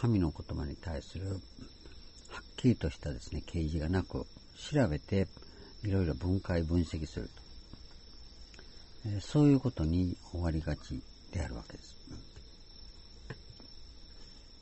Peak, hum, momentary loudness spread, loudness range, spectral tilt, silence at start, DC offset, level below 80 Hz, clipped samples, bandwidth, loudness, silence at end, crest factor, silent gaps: -16 dBFS; none; 22 LU; 9 LU; -7.5 dB/octave; 0 s; under 0.1%; -46 dBFS; under 0.1%; 8.2 kHz; -34 LUFS; 0 s; 20 dB; none